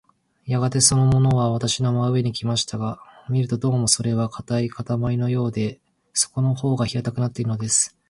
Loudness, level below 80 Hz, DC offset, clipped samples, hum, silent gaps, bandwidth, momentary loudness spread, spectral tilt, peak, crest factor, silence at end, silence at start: -21 LUFS; -48 dBFS; under 0.1%; under 0.1%; none; none; 11.5 kHz; 9 LU; -5 dB/octave; -2 dBFS; 20 dB; 0.2 s; 0.45 s